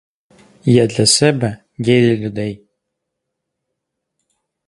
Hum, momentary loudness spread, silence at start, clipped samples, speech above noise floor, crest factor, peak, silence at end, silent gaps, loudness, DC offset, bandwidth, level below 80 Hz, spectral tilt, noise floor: none; 13 LU; 0.65 s; under 0.1%; 63 dB; 18 dB; 0 dBFS; 2.1 s; none; -15 LUFS; under 0.1%; 11.5 kHz; -52 dBFS; -4.5 dB/octave; -77 dBFS